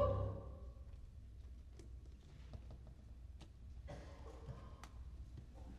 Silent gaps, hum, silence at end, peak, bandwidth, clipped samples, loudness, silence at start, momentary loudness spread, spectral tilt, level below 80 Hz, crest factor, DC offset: none; none; 0 s; -24 dBFS; 10.5 kHz; under 0.1%; -53 LUFS; 0 s; 9 LU; -8 dB/octave; -54 dBFS; 24 dB; under 0.1%